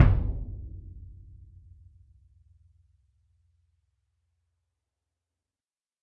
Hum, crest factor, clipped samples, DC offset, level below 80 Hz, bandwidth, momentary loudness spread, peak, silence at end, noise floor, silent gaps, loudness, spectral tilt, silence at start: none; 28 dB; under 0.1%; under 0.1%; -36 dBFS; 4.2 kHz; 26 LU; -4 dBFS; 4.9 s; under -90 dBFS; none; -31 LUFS; -8.5 dB/octave; 0 s